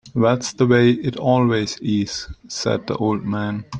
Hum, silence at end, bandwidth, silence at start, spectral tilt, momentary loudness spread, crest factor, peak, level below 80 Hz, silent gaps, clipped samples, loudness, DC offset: none; 0 s; 9.8 kHz; 0.05 s; -6 dB/octave; 10 LU; 16 dB; -2 dBFS; -48 dBFS; none; under 0.1%; -20 LUFS; under 0.1%